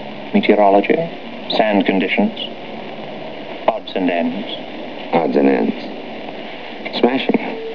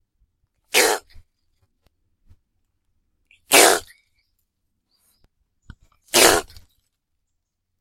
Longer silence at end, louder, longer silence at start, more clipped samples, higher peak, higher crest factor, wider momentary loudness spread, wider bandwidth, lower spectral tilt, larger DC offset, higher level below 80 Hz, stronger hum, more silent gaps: second, 0 s vs 1.4 s; about the same, -17 LUFS vs -16 LUFS; second, 0 s vs 0.75 s; neither; about the same, -2 dBFS vs 0 dBFS; second, 18 dB vs 24 dB; first, 16 LU vs 10 LU; second, 5.4 kHz vs 16.5 kHz; first, -7.5 dB/octave vs -0.5 dB/octave; first, 2% vs under 0.1%; second, -60 dBFS vs -52 dBFS; neither; neither